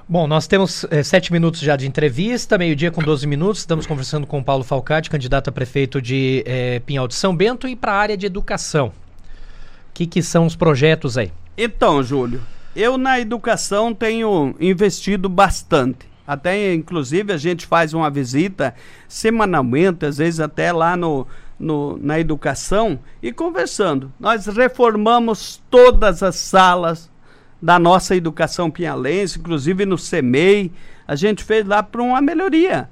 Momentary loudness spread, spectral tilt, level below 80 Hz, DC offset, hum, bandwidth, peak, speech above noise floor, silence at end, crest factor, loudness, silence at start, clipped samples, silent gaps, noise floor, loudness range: 9 LU; -5.5 dB/octave; -34 dBFS; under 0.1%; none; 14.5 kHz; -2 dBFS; 28 dB; 0.05 s; 16 dB; -17 LUFS; 0.1 s; under 0.1%; none; -44 dBFS; 6 LU